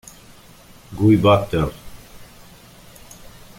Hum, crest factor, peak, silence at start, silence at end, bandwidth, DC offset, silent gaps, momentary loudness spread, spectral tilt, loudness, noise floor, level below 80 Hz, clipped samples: none; 20 dB; -2 dBFS; 0.9 s; 1.35 s; 17 kHz; under 0.1%; none; 27 LU; -7 dB/octave; -17 LUFS; -46 dBFS; -42 dBFS; under 0.1%